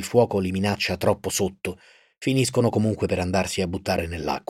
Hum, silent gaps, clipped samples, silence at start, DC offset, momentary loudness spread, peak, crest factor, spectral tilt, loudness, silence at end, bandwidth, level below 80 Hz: none; none; under 0.1%; 0 s; under 0.1%; 7 LU; -6 dBFS; 18 dB; -5 dB/octave; -24 LUFS; 0.1 s; 16.5 kHz; -48 dBFS